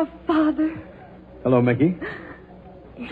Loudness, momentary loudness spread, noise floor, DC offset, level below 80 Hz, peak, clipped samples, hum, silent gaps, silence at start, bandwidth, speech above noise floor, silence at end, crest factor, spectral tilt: -22 LUFS; 23 LU; -44 dBFS; under 0.1%; -50 dBFS; -6 dBFS; under 0.1%; none; none; 0 s; 4.7 kHz; 23 dB; 0 s; 18 dB; -10 dB/octave